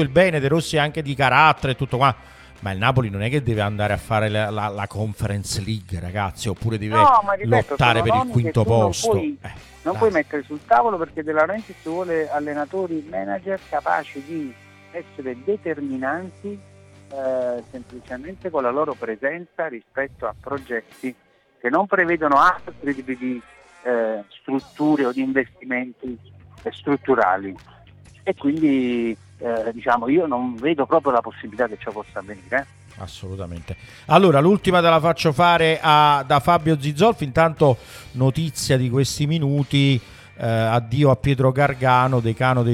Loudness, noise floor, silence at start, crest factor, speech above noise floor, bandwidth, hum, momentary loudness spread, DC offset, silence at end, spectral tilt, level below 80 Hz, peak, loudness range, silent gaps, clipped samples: -20 LUFS; -47 dBFS; 0 s; 20 dB; 27 dB; 15 kHz; none; 17 LU; under 0.1%; 0 s; -6 dB/octave; -48 dBFS; 0 dBFS; 10 LU; none; under 0.1%